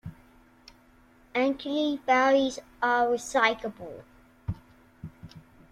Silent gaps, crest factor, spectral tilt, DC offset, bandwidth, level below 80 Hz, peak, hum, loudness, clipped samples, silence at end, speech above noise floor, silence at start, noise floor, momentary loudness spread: none; 22 dB; -4.5 dB/octave; under 0.1%; 14 kHz; -56 dBFS; -8 dBFS; none; -26 LUFS; under 0.1%; 0.3 s; 32 dB; 0.05 s; -58 dBFS; 23 LU